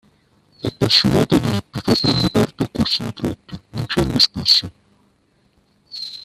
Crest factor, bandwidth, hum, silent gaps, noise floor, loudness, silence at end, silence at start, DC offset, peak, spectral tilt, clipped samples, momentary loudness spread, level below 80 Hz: 20 dB; 14.5 kHz; none; none; -60 dBFS; -17 LUFS; 0 s; 0.65 s; under 0.1%; 0 dBFS; -5 dB/octave; under 0.1%; 16 LU; -42 dBFS